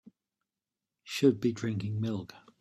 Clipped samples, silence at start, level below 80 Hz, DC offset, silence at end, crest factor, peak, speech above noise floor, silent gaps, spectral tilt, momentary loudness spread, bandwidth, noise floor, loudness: under 0.1%; 1.05 s; -70 dBFS; under 0.1%; 0.2 s; 22 dB; -12 dBFS; over 60 dB; none; -6.5 dB/octave; 13 LU; 13.5 kHz; under -90 dBFS; -31 LUFS